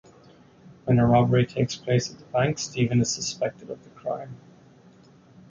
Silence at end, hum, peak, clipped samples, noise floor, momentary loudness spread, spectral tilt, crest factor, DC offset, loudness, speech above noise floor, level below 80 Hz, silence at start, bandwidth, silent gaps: 1.15 s; none; -6 dBFS; under 0.1%; -53 dBFS; 16 LU; -5.5 dB/octave; 18 dB; under 0.1%; -24 LUFS; 29 dB; -52 dBFS; 0.85 s; 7.6 kHz; none